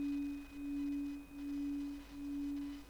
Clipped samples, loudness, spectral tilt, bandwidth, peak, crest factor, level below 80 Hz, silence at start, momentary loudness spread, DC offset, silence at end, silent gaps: under 0.1%; -43 LUFS; -5.5 dB/octave; over 20 kHz; -34 dBFS; 8 dB; -60 dBFS; 0 s; 6 LU; under 0.1%; 0 s; none